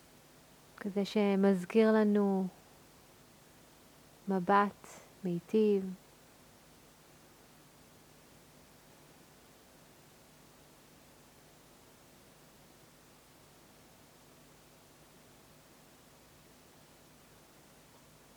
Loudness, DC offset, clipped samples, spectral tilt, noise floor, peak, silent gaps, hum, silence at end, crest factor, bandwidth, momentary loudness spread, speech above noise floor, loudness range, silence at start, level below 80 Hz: -31 LUFS; under 0.1%; under 0.1%; -7 dB/octave; -60 dBFS; -14 dBFS; none; none; 12.4 s; 24 dB; over 20 kHz; 20 LU; 31 dB; 6 LU; 0.85 s; -74 dBFS